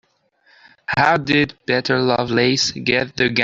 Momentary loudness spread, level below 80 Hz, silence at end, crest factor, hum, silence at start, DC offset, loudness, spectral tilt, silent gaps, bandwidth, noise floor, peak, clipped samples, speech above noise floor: 4 LU; -52 dBFS; 0 s; 16 dB; none; 0.9 s; under 0.1%; -18 LUFS; -4 dB/octave; none; 7.8 kHz; -59 dBFS; -2 dBFS; under 0.1%; 41 dB